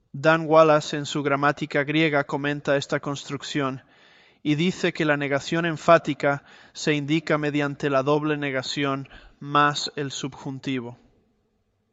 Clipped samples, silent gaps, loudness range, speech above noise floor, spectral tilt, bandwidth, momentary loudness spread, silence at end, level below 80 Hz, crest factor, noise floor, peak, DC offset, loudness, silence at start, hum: under 0.1%; none; 4 LU; 47 dB; -5.5 dB/octave; 8.2 kHz; 13 LU; 1 s; -62 dBFS; 22 dB; -70 dBFS; -2 dBFS; under 0.1%; -23 LUFS; 0.15 s; none